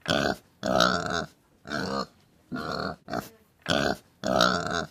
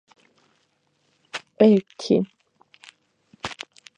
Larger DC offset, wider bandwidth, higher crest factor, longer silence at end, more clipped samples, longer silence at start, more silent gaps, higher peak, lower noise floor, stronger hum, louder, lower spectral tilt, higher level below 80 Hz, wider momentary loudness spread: neither; first, 15.5 kHz vs 9.6 kHz; about the same, 26 dB vs 22 dB; second, 0 s vs 0.45 s; neither; second, 0.05 s vs 1.35 s; neither; about the same, -4 dBFS vs -2 dBFS; second, -48 dBFS vs -68 dBFS; neither; second, -28 LUFS vs -22 LUFS; second, -4 dB/octave vs -6.5 dB/octave; first, -52 dBFS vs -66 dBFS; second, 15 LU vs 19 LU